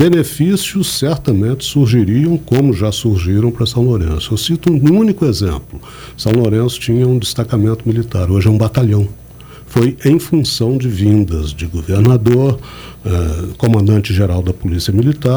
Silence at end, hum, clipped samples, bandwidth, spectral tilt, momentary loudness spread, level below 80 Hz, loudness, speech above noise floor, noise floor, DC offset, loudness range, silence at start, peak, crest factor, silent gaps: 0 s; none; under 0.1%; over 20 kHz; -6.5 dB/octave; 8 LU; -30 dBFS; -14 LUFS; 22 dB; -35 dBFS; under 0.1%; 1 LU; 0 s; 0 dBFS; 12 dB; none